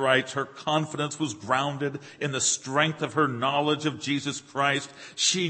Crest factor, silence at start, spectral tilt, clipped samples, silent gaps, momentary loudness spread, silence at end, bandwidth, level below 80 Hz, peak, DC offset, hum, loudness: 20 dB; 0 s; -3 dB/octave; under 0.1%; none; 8 LU; 0 s; 8.8 kHz; -70 dBFS; -6 dBFS; under 0.1%; none; -26 LUFS